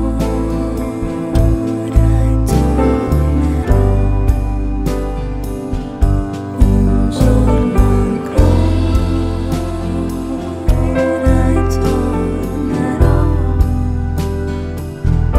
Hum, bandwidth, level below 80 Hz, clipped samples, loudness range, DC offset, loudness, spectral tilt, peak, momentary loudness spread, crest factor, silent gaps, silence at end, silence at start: none; 14 kHz; -16 dBFS; under 0.1%; 3 LU; under 0.1%; -16 LUFS; -8 dB/octave; 0 dBFS; 8 LU; 14 dB; none; 0 s; 0 s